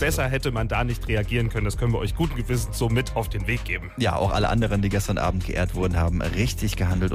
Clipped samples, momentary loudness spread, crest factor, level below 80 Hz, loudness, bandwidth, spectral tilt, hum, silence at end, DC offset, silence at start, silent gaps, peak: under 0.1%; 4 LU; 14 dB; -30 dBFS; -25 LUFS; 15.5 kHz; -5.5 dB/octave; none; 0 s; under 0.1%; 0 s; none; -10 dBFS